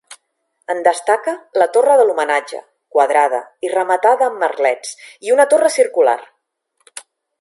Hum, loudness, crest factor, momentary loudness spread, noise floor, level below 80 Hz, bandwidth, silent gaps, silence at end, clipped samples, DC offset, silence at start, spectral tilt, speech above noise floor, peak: none; -15 LUFS; 16 dB; 19 LU; -67 dBFS; -78 dBFS; 11.5 kHz; none; 0.4 s; under 0.1%; under 0.1%; 0.1 s; -1.5 dB/octave; 52 dB; 0 dBFS